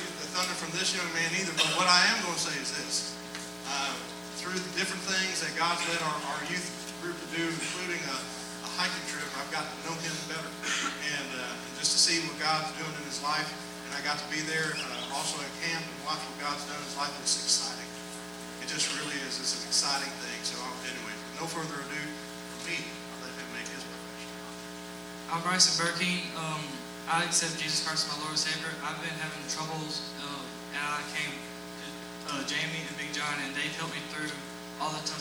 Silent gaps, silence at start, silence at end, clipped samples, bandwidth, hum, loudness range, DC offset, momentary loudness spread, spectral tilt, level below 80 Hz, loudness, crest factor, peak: none; 0 s; 0 s; under 0.1%; over 20 kHz; none; 7 LU; under 0.1%; 13 LU; -1.5 dB/octave; -64 dBFS; -31 LUFS; 26 dB; -6 dBFS